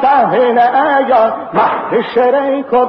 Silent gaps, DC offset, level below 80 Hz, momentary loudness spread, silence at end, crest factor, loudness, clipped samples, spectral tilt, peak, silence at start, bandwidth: none; under 0.1%; -54 dBFS; 4 LU; 0 s; 10 dB; -12 LUFS; under 0.1%; -8 dB/octave; -2 dBFS; 0 s; 5.6 kHz